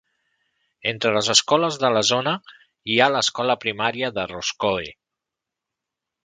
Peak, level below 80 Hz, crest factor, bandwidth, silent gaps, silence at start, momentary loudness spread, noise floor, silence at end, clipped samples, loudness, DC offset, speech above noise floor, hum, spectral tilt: 0 dBFS; -60 dBFS; 24 dB; 9.6 kHz; none; 0.85 s; 11 LU; -86 dBFS; 1.35 s; under 0.1%; -21 LUFS; under 0.1%; 64 dB; none; -2.5 dB/octave